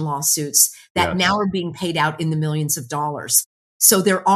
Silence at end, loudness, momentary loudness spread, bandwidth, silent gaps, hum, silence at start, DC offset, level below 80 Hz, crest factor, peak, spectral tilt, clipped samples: 0 s; -18 LUFS; 10 LU; 13.5 kHz; 0.90-0.95 s, 3.46-3.80 s; none; 0 s; under 0.1%; -52 dBFS; 20 dB; 0 dBFS; -3 dB/octave; under 0.1%